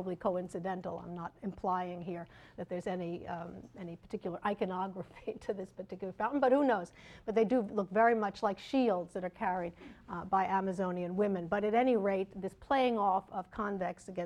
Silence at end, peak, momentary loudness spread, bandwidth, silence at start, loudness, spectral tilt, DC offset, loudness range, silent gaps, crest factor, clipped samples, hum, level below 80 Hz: 0 s; -16 dBFS; 15 LU; 11.5 kHz; 0 s; -34 LUFS; -7 dB/octave; under 0.1%; 8 LU; none; 18 dB; under 0.1%; none; -64 dBFS